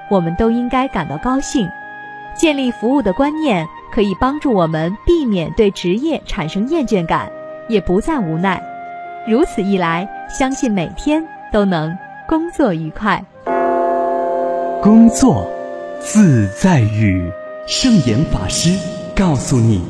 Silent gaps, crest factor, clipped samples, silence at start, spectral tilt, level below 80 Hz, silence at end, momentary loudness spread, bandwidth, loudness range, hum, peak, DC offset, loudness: none; 16 dB; under 0.1%; 0 s; -6 dB/octave; -34 dBFS; 0 s; 11 LU; 11 kHz; 5 LU; none; 0 dBFS; under 0.1%; -16 LUFS